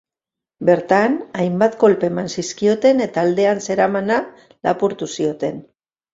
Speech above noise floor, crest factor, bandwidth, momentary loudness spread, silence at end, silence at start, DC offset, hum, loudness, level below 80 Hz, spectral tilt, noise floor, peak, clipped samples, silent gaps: 70 dB; 16 dB; 7.8 kHz; 9 LU; 0.5 s; 0.6 s; under 0.1%; none; -18 LUFS; -60 dBFS; -5.5 dB/octave; -87 dBFS; -2 dBFS; under 0.1%; none